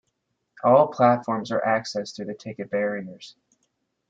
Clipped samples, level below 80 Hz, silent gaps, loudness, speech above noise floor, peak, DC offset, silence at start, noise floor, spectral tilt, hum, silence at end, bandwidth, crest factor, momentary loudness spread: under 0.1%; -70 dBFS; none; -23 LUFS; 53 dB; -4 dBFS; under 0.1%; 0.65 s; -76 dBFS; -6 dB/octave; none; 0.8 s; 7.8 kHz; 20 dB; 16 LU